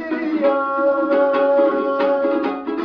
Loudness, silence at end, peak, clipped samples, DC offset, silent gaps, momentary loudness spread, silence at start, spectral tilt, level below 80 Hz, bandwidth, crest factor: -18 LUFS; 0 s; -4 dBFS; under 0.1%; under 0.1%; none; 5 LU; 0 s; -7 dB/octave; -62 dBFS; 5.4 kHz; 14 dB